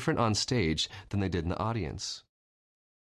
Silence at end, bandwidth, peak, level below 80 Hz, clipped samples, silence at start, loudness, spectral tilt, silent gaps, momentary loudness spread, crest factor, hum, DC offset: 0.8 s; 13 kHz; -16 dBFS; -46 dBFS; under 0.1%; 0 s; -31 LUFS; -4.5 dB/octave; none; 9 LU; 16 dB; none; under 0.1%